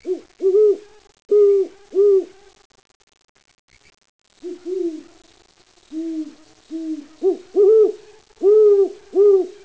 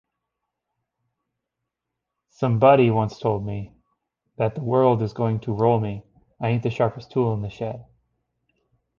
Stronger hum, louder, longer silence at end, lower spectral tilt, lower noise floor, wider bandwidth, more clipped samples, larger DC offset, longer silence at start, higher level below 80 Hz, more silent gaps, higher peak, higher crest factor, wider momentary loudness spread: neither; first, -17 LUFS vs -22 LUFS; second, 0.15 s vs 1.15 s; second, -5.5 dB/octave vs -9 dB/octave; second, -41 dBFS vs -83 dBFS; first, 8 kHz vs 7 kHz; neither; first, 0.2% vs under 0.1%; second, 0.05 s vs 2.4 s; second, -68 dBFS vs -54 dBFS; first, 2.65-2.70 s, 2.95-3.00 s, 3.29-3.35 s, 3.59-3.68 s, 4.09-4.19 s vs none; second, -6 dBFS vs -2 dBFS; second, 12 dB vs 22 dB; first, 21 LU vs 15 LU